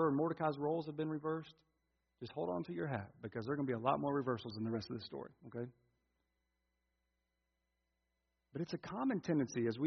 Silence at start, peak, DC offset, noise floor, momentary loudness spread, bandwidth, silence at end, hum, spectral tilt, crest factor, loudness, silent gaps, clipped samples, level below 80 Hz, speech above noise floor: 0 s; -20 dBFS; under 0.1%; -86 dBFS; 13 LU; 6.2 kHz; 0 s; none; -6.5 dB/octave; 22 dB; -40 LUFS; none; under 0.1%; -78 dBFS; 47 dB